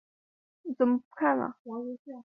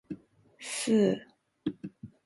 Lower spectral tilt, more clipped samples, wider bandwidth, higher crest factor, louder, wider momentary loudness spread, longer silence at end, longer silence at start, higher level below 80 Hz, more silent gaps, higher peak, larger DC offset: first, -9.5 dB/octave vs -5 dB/octave; neither; second, 3.1 kHz vs 12 kHz; about the same, 18 dB vs 18 dB; about the same, -30 LUFS vs -30 LUFS; second, 13 LU vs 20 LU; second, 0.05 s vs 0.2 s; first, 0.65 s vs 0.1 s; second, -80 dBFS vs -70 dBFS; first, 1.05-1.11 s, 1.59-1.65 s, 1.99-2.05 s vs none; about the same, -12 dBFS vs -14 dBFS; neither